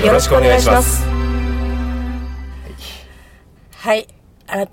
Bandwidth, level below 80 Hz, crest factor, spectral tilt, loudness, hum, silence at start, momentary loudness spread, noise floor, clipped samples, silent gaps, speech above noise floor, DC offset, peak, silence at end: 16.5 kHz; -22 dBFS; 16 dB; -4.5 dB/octave; -16 LUFS; none; 0 s; 21 LU; -45 dBFS; under 0.1%; none; 33 dB; under 0.1%; 0 dBFS; 0.05 s